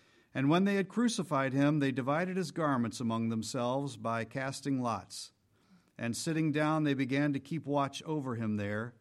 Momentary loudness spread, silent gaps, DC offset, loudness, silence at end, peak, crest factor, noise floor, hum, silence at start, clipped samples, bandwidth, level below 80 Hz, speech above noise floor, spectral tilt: 8 LU; none; under 0.1%; -33 LUFS; 0.1 s; -16 dBFS; 16 dB; -66 dBFS; none; 0.35 s; under 0.1%; 13.5 kHz; -74 dBFS; 34 dB; -6 dB/octave